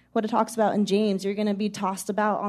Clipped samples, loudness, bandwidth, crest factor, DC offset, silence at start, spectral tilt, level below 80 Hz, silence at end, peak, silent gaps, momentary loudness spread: under 0.1%; -25 LUFS; 13.5 kHz; 16 dB; under 0.1%; 0.15 s; -5.5 dB/octave; -70 dBFS; 0 s; -8 dBFS; none; 5 LU